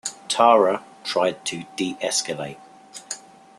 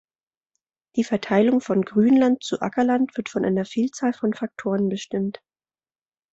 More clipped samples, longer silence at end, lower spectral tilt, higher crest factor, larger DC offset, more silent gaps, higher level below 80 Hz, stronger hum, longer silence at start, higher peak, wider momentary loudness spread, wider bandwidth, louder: neither; second, 0.4 s vs 1 s; second, -2.5 dB/octave vs -6.5 dB/octave; about the same, 22 dB vs 18 dB; neither; neither; second, -70 dBFS vs -64 dBFS; neither; second, 0.05 s vs 0.95 s; first, 0 dBFS vs -6 dBFS; first, 19 LU vs 9 LU; first, 12.5 kHz vs 8 kHz; about the same, -22 LUFS vs -22 LUFS